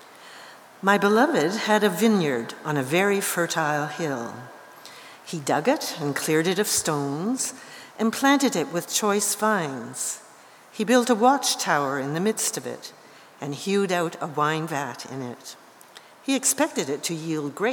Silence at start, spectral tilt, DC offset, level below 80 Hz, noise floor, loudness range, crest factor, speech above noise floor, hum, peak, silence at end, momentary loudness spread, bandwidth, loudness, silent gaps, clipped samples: 0 s; -3.5 dB/octave; under 0.1%; -72 dBFS; -50 dBFS; 5 LU; 20 dB; 26 dB; none; -4 dBFS; 0 s; 20 LU; over 20 kHz; -23 LUFS; none; under 0.1%